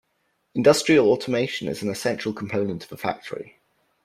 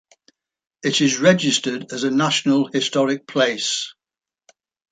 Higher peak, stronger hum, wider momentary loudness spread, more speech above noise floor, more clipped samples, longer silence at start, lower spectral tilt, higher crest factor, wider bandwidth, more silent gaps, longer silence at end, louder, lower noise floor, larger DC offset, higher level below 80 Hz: about the same, -4 dBFS vs -2 dBFS; neither; first, 16 LU vs 9 LU; second, 49 dB vs 71 dB; neither; second, 0.55 s vs 0.85 s; first, -5 dB/octave vs -3.5 dB/octave; about the same, 20 dB vs 18 dB; first, 15.5 kHz vs 9.4 kHz; neither; second, 0.55 s vs 1 s; second, -23 LUFS vs -19 LUFS; second, -71 dBFS vs -90 dBFS; neither; first, -62 dBFS vs -68 dBFS